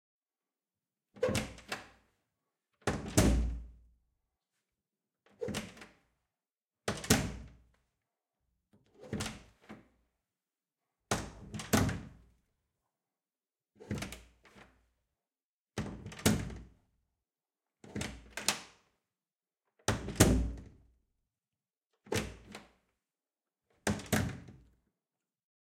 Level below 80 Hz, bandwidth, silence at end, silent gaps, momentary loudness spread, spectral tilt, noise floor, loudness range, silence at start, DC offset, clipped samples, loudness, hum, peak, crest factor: -48 dBFS; 16.5 kHz; 1.05 s; 15.44-15.65 s, 21.77-21.90 s; 22 LU; -4.5 dB/octave; under -90 dBFS; 12 LU; 1.15 s; under 0.1%; under 0.1%; -35 LUFS; none; -8 dBFS; 32 dB